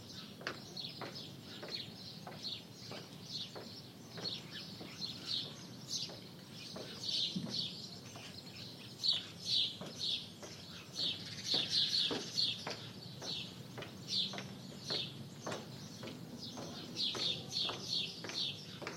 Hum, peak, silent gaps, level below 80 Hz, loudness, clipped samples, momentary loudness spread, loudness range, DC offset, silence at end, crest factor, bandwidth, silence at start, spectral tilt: none; -20 dBFS; none; -78 dBFS; -39 LUFS; under 0.1%; 15 LU; 9 LU; under 0.1%; 0 s; 22 dB; 16 kHz; 0 s; -2.5 dB/octave